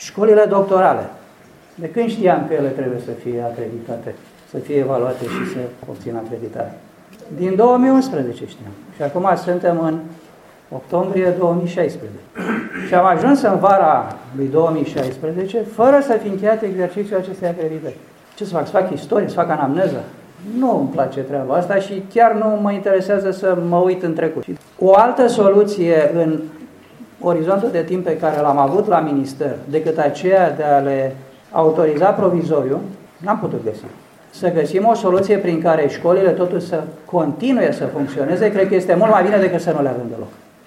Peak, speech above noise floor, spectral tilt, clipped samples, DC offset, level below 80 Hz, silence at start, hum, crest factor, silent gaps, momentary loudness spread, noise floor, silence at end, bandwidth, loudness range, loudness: 0 dBFS; 29 dB; -7.5 dB/octave; under 0.1%; under 0.1%; -62 dBFS; 0 s; none; 16 dB; none; 15 LU; -45 dBFS; 0.3 s; 15 kHz; 6 LU; -17 LUFS